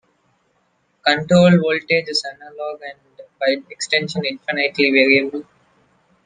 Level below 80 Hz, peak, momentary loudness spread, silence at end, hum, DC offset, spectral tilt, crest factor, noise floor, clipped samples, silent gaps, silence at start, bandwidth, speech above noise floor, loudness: -60 dBFS; 0 dBFS; 17 LU; 0.85 s; none; under 0.1%; -5 dB/octave; 18 dB; -64 dBFS; under 0.1%; none; 1.05 s; 9.6 kHz; 47 dB; -17 LUFS